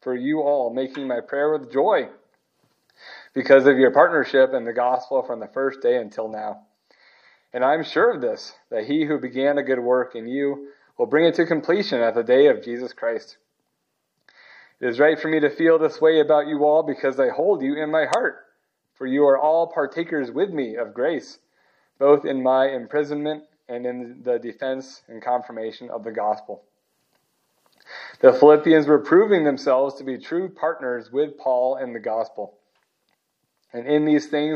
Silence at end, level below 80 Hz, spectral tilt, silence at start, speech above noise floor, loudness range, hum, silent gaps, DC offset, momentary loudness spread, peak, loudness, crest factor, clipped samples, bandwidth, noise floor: 0 s; -82 dBFS; -6 dB/octave; 0.05 s; 55 dB; 8 LU; none; none; under 0.1%; 15 LU; 0 dBFS; -21 LUFS; 22 dB; under 0.1%; 8.6 kHz; -75 dBFS